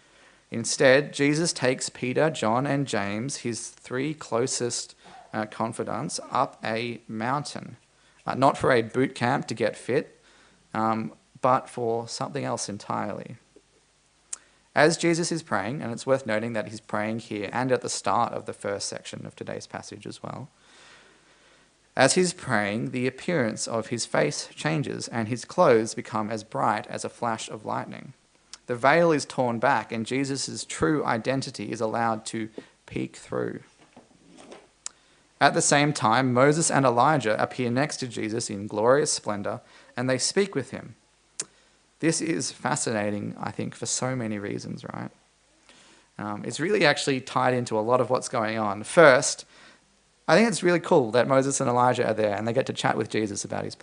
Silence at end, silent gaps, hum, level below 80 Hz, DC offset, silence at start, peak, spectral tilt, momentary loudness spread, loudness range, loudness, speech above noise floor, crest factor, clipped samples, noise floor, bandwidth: 0.1 s; none; none; -66 dBFS; under 0.1%; 0.5 s; -2 dBFS; -4 dB/octave; 16 LU; 8 LU; -25 LUFS; 38 dB; 24 dB; under 0.1%; -63 dBFS; 10.5 kHz